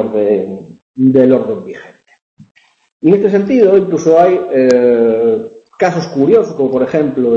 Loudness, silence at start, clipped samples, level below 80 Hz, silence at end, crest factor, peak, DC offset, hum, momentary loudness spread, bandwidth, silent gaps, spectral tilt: -11 LUFS; 0 s; under 0.1%; -54 dBFS; 0 s; 12 dB; 0 dBFS; under 0.1%; none; 15 LU; 7.6 kHz; 0.82-0.94 s, 2.22-2.37 s, 2.51-2.55 s, 2.92-3.00 s; -7.5 dB/octave